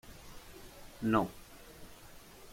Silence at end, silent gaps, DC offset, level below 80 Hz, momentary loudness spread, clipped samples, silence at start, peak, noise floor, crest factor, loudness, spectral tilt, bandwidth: 0 s; none; under 0.1%; -58 dBFS; 23 LU; under 0.1%; 0.05 s; -16 dBFS; -54 dBFS; 22 dB; -34 LUFS; -6 dB/octave; 16.5 kHz